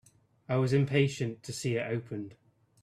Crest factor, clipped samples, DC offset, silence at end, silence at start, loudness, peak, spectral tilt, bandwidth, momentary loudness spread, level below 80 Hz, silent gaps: 18 dB; under 0.1%; under 0.1%; 0.5 s; 0.5 s; -31 LUFS; -14 dBFS; -6 dB/octave; 13.5 kHz; 14 LU; -66 dBFS; none